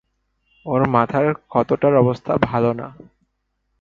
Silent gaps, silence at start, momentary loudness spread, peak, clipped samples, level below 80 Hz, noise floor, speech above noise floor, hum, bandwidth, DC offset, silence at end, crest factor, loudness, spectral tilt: none; 0.65 s; 11 LU; 0 dBFS; under 0.1%; -50 dBFS; -72 dBFS; 54 dB; none; 7.2 kHz; under 0.1%; 0.9 s; 20 dB; -19 LUFS; -9.5 dB/octave